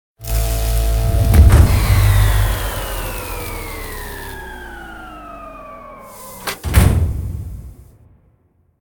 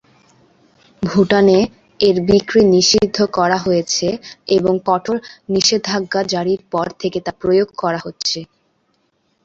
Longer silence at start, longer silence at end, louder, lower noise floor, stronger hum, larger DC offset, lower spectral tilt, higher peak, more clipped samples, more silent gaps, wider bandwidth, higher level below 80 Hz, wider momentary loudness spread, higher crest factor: second, 0.2 s vs 1 s; about the same, 1.1 s vs 1 s; about the same, -17 LUFS vs -16 LUFS; second, -58 dBFS vs -64 dBFS; neither; neither; first, -5.5 dB/octave vs -4 dB/octave; about the same, 0 dBFS vs 0 dBFS; neither; neither; first, over 20 kHz vs 7.8 kHz; first, -20 dBFS vs -48 dBFS; first, 22 LU vs 10 LU; about the same, 16 dB vs 16 dB